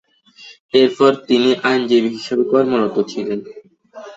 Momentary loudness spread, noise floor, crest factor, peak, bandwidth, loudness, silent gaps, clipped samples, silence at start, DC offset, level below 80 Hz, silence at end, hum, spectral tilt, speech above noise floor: 9 LU; -44 dBFS; 16 dB; -2 dBFS; 8 kHz; -16 LUFS; 0.60-0.69 s; under 0.1%; 0.4 s; under 0.1%; -62 dBFS; 0 s; none; -5.5 dB/octave; 28 dB